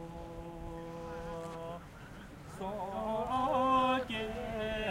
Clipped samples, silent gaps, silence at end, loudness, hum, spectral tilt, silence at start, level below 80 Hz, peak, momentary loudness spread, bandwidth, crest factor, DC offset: under 0.1%; none; 0 s; -36 LUFS; none; -5.5 dB/octave; 0 s; -52 dBFS; -18 dBFS; 19 LU; 16 kHz; 18 dB; under 0.1%